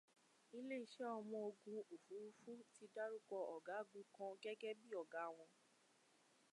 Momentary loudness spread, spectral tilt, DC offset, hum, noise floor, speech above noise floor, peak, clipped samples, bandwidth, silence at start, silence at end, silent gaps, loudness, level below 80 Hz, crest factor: 8 LU; -4.5 dB/octave; under 0.1%; none; -77 dBFS; 25 dB; -38 dBFS; under 0.1%; 11 kHz; 0.5 s; 1 s; none; -53 LUFS; under -90 dBFS; 16 dB